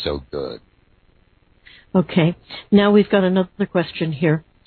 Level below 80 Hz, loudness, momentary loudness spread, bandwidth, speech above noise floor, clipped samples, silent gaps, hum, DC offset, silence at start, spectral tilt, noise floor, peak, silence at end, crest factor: -48 dBFS; -19 LUFS; 15 LU; 4.5 kHz; 38 dB; under 0.1%; none; none; under 0.1%; 0 s; -10.5 dB/octave; -56 dBFS; -2 dBFS; 0.25 s; 18 dB